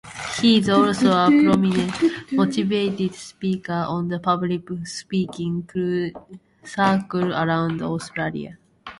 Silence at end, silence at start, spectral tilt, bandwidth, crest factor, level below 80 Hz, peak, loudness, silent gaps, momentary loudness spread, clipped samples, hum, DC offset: 0.05 s; 0.05 s; -6 dB/octave; 11.5 kHz; 16 dB; -56 dBFS; -4 dBFS; -21 LUFS; none; 13 LU; under 0.1%; none; under 0.1%